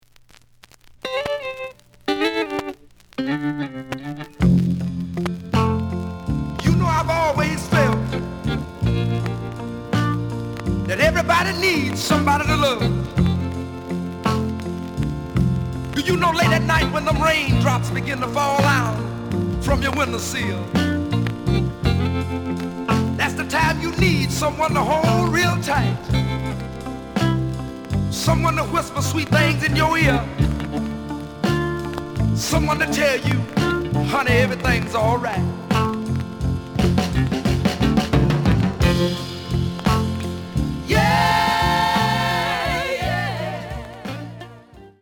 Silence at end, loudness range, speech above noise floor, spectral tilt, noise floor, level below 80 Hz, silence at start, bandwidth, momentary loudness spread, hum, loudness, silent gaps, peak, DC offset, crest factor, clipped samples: 0.15 s; 4 LU; 31 dB; -5.5 dB/octave; -50 dBFS; -34 dBFS; 1.05 s; over 20 kHz; 10 LU; none; -21 LUFS; none; -4 dBFS; under 0.1%; 18 dB; under 0.1%